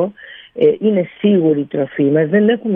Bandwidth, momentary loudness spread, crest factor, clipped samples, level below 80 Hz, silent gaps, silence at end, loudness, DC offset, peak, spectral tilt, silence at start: 3.7 kHz; 7 LU; 14 dB; under 0.1%; -64 dBFS; none; 0 s; -15 LUFS; under 0.1%; -2 dBFS; -11 dB/octave; 0 s